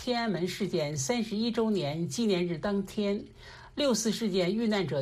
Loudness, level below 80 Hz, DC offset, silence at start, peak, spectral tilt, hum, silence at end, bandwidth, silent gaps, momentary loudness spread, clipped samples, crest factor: -30 LUFS; -58 dBFS; under 0.1%; 0 s; -16 dBFS; -5 dB/octave; none; 0 s; 15 kHz; none; 4 LU; under 0.1%; 14 dB